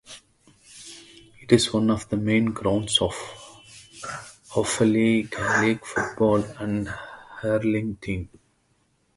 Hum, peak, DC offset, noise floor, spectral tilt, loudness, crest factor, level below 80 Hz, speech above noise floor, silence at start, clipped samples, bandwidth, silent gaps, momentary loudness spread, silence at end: none; -2 dBFS; under 0.1%; -67 dBFS; -4.5 dB/octave; -23 LUFS; 22 dB; -50 dBFS; 44 dB; 0.1 s; under 0.1%; 11.5 kHz; none; 22 LU; 0.9 s